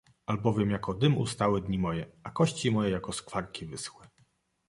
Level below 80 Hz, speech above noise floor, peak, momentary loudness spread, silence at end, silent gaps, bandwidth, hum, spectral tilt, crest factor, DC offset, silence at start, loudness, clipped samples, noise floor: -54 dBFS; 39 dB; -10 dBFS; 12 LU; 0.6 s; none; 11.5 kHz; none; -6 dB/octave; 20 dB; under 0.1%; 0.3 s; -30 LUFS; under 0.1%; -69 dBFS